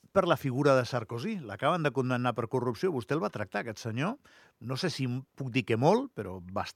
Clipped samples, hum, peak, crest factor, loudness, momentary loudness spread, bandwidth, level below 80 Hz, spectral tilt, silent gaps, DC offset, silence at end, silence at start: under 0.1%; none; -10 dBFS; 20 dB; -31 LUFS; 11 LU; 15 kHz; -70 dBFS; -6.5 dB/octave; none; under 0.1%; 0.05 s; 0.15 s